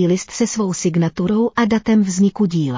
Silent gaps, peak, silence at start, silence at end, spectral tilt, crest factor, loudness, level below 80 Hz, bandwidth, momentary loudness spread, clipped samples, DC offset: none; -6 dBFS; 0 s; 0 s; -6 dB/octave; 12 dB; -17 LUFS; -50 dBFS; 7.6 kHz; 4 LU; under 0.1%; under 0.1%